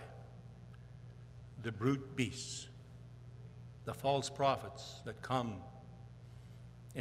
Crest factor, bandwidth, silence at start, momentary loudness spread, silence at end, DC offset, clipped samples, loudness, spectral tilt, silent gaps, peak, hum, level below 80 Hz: 24 dB; 15 kHz; 0 s; 20 LU; 0 s; under 0.1%; under 0.1%; -39 LUFS; -5 dB/octave; none; -18 dBFS; none; -64 dBFS